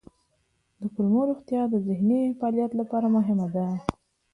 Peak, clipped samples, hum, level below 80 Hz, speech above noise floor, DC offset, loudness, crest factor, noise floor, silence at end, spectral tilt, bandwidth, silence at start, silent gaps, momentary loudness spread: -6 dBFS; under 0.1%; none; -58 dBFS; 47 dB; under 0.1%; -26 LUFS; 20 dB; -71 dBFS; 0.45 s; -9.5 dB/octave; 10 kHz; 0.8 s; none; 8 LU